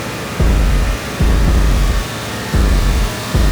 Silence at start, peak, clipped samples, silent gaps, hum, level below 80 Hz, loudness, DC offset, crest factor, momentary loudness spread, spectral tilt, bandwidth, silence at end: 0 s; -2 dBFS; under 0.1%; none; none; -14 dBFS; -16 LUFS; under 0.1%; 12 dB; 6 LU; -5 dB/octave; over 20 kHz; 0 s